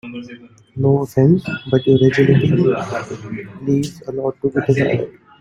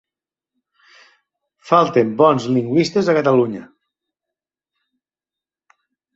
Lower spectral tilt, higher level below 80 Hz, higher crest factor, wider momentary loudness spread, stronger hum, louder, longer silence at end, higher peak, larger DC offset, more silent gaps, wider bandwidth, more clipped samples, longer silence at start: first, -8 dB/octave vs -6.5 dB/octave; first, -50 dBFS vs -62 dBFS; about the same, 16 dB vs 18 dB; first, 17 LU vs 4 LU; neither; about the same, -17 LUFS vs -16 LUFS; second, 0.3 s vs 2.5 s; about the same, -2 dBFS vs -2 dBFS; neither; neither; first, 12.5 kHz vs 8 kHz; neither; second, 0.05 s vs 1.65 s